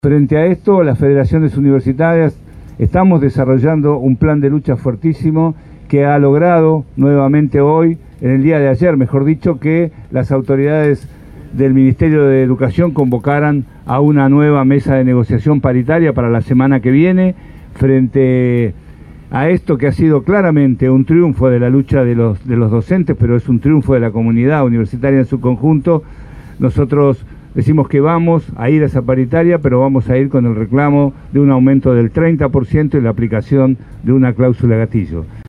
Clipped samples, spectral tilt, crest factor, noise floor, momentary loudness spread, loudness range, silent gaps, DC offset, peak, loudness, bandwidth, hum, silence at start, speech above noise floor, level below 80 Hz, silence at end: under 0.1%; -11 dB/octave; 10 dB; -34 dBFS; 6 LU; 2 LU; none; under 0.1%; 0 dBFS; -12 LUFS; 5 kHz; none; 0.05 s; 23 dB; -34 dBFS; 0.05 s